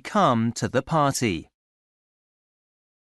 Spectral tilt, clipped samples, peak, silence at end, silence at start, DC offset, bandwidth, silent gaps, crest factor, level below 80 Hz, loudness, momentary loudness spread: -5 dB/octave; under 0.1%; -6 dBFS; 1.65 s; 0.05 s; under 0.1%; 12 kHz; none; 20 dB; -56 dBFS; -23 LUFS; 6 LU